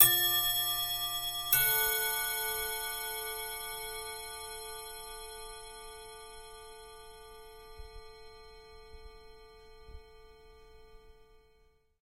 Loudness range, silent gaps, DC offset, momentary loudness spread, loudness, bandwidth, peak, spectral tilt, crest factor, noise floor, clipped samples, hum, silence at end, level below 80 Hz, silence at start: 24 LU; none; under 0.1%; 26 LU; -31 LUFS; 16 kHz; -4 dBFS; 0.5 dB/octave; 32 dB; -67 dBFS; under 0.1%; none; 0.75 s; -56 dBFS; 0 s